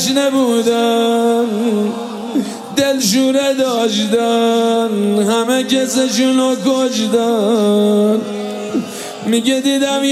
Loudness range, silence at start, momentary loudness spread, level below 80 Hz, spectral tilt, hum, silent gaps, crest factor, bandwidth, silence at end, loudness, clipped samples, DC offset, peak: 1 LU; 0 s; 7 LU; -64 dBFS; -4 dB/octave; none; none; 14 dB; 16 kHz; 0 s; -15 LUFS; under 0.1%; under 0.1%; -2 dBFS